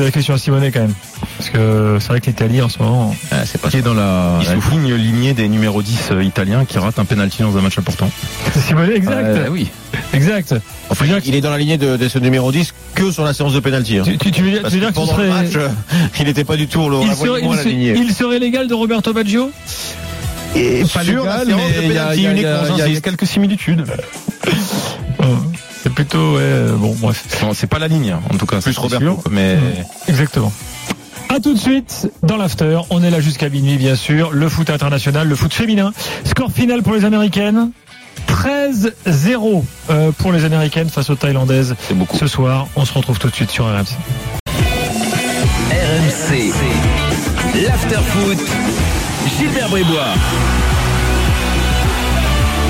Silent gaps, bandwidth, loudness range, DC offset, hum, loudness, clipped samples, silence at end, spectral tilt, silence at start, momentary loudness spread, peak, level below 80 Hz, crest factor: 44.40-44.46 s; 16.5 kHz; 2 LU; under 0.1%; none; -15 LUFS; under 0.1%; 0 s; -5.5 dB/octave; 0 s; 5 LU; -4 dBFS; -28 dBFS; 12 dB